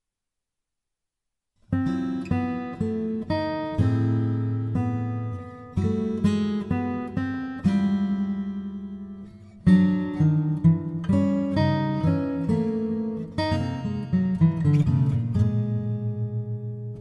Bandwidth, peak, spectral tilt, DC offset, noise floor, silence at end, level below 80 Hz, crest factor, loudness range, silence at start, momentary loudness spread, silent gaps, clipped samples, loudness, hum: 8.8 kHz; -8 dBFS; -9 dB/octave; under 0.1%; -86 dBFS; 0 s; -48 dBFS; 18 dB; 4 LU; 1.7 s; 10 LU; none; under 0.1%; -25 LUFS; none